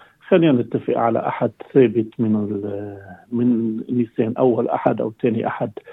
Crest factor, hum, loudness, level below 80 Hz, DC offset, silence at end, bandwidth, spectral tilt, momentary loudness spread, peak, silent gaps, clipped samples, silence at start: 18 dB; none; -20 LUFS; -66 dBFS; under 0.1%; 0 s; 4 kHz; -10.5 dB/octave; 11 LU; -2 dBFS; none; under 0.1%; 0.25 s